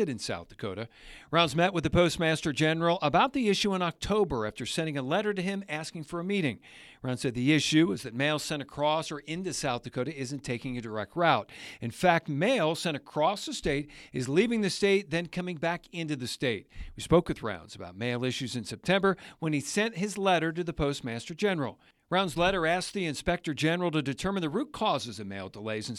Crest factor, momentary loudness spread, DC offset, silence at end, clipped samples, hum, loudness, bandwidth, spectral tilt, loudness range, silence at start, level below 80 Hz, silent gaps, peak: 22 dB; 11 LU; under 0.1%; 0 s; under 0.1%; none; -29 LUFS; 14 kHz; -5 dB/octave; 4 LU; 0 s; -52 dBFS; none; -8 dBFS